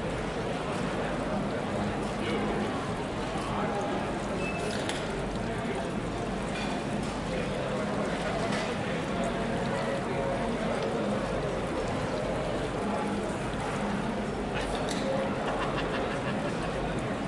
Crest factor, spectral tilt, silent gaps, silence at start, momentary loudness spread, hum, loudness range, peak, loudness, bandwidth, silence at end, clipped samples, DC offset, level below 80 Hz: 18 dB; -5.5 dB/octave; none; 0 s; 2 LU; none; 1 LU; -14 dBFS; -31 LUFS; 11.5 kHz; 0 s; under 0.1%; under 0.1%; -46 dBFS